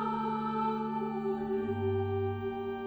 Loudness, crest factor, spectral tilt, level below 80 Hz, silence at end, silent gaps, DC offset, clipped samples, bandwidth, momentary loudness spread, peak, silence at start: -33 LUFS; 12 dB; -9.5 dB/octave; -62 dBFS; 0 s; none; under 0.1%; under 0.1%; over 20 kHz; 2 LU; -20 dBFS; 0 s